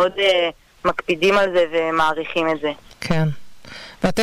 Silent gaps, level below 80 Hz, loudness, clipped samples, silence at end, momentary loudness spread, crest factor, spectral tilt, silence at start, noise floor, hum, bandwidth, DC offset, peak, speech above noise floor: none; -44 dBFS; -20 LUFS; under 0.1%; 0 s; 16 LU; 12 dB; -5.5 dB/octave; 0 s; -39 dBFS; none; 15.5 kHz; under 0.1%; -8 dBFS; 20 dB